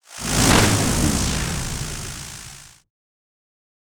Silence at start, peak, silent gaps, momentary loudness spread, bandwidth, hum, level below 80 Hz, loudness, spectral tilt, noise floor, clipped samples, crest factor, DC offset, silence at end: 0.1 s; -2 dBFS; none; 19 LU; over 20 kHz; none; -32 dBFS; -19 LUFS; -3.5 dB/octave; -42 dBFS; under 0.1%; 20 dB; under 0.1%; 1.15 s